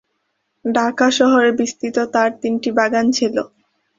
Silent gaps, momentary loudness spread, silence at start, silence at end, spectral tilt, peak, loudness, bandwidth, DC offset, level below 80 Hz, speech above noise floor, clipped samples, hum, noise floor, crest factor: none; 8 LU; 0.65 s; 0.5 s; -3.5 dB/octave; -2 dBFS; -17 LUFS; 7.8 kHz; under 0.1%; -62 dBFS; 54 dB; under 0.1%; none; -70 dBFS; 16 dB